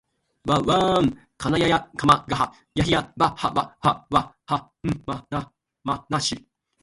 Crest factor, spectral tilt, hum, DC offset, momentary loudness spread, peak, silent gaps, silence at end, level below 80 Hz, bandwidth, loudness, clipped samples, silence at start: 22 dB; -5 dB/octave; none; under 0.1%; 11 LU; -2 dBFS; none; 0.45 s; -46 dBFS; 11.5 kHz; -23 LUFS; under 0.1%; 0.45 s